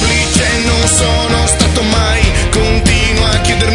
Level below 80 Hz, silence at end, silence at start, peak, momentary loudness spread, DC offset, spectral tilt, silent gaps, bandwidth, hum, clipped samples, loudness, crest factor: -16 dBFS; 0 s; 0 s; 0 dBFS; 2 LU; under 0.1%; -3.5 dB/octave; none; 11 kHz; none; under 0.1%; -11 LUFS; 10 dB